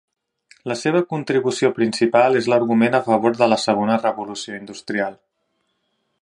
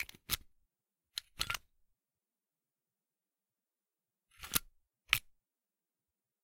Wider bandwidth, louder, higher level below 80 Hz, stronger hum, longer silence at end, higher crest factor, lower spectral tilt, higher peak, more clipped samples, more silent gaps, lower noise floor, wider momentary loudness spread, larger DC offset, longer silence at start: second, 11 kHz vs 16.5 kHz; first, -19 LUFS vs -38 LUFS; about the same, -66 dBFS vs -62 dBFS; neither; second, 1.05 s vs 1.25 s; second, 20 dB vs 40 dB; first, -5 dB/octave vs 0 dB/octave; first, 0 dBFS vs -6 dBFS; neither; neither; second, -71 dBFS vs under -90 dBFS; about the same, 12 LU vs 12 LU; neither; first, 0.65 s vs 0 s